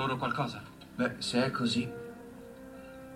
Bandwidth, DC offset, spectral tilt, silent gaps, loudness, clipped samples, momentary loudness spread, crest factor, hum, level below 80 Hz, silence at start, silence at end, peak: 15.5 kHz; under 0.1%; -5 dB/octave; none; -32 LUFS; under 0.1%; 18 LU; 18 dB; none; -62 dBFS; 0 s; 0 s; -16 dBFS